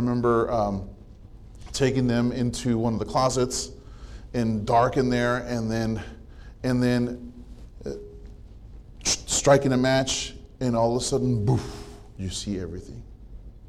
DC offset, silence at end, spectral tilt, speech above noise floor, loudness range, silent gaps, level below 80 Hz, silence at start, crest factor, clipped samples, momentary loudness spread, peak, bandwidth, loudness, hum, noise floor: under 0.1%; 0 s; -5 dB/octave; 21 dB; 5 LU; none; -42 dBFS; 0 s; 18 dB; under 0.1%; 20 LU; -8 dBFS; 14 kHz; -25 LUFS; none; -45 dBFS